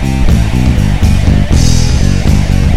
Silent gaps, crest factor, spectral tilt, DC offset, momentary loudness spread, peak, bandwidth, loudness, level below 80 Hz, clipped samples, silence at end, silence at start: none; 8 dB; -6 dB/octave; 10%; 1 LU; 0 dBFS; 15 kHz; -10 LUFS; -12 dBFS; 0.3%; 0 s; 0 s